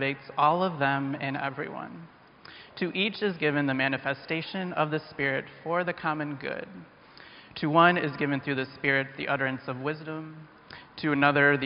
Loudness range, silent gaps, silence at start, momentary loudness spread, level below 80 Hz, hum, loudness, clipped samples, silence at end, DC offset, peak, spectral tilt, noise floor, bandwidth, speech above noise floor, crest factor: 4 LU; none; 0 s; 22 LU; -68 dBFS; none; -28 LUFS; under 0.1%; 0 s; under 0.1%; -6 dBFS; -3.5 dB/octave; -51 dBFS; 5.4 kHz; 23 dB; 22 dB